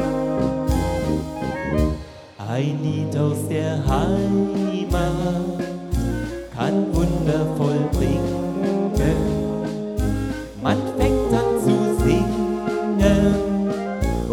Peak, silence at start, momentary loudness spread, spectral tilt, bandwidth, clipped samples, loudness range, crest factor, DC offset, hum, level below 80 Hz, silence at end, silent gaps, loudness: -4 dBFS; 0 s; 7 LU; -7 dB/octave; 18 kHz; under 0.1%; 4 LU; 16 dB; under 0.1%; none; -30 dBFS; 0 s; none; -22 LUFS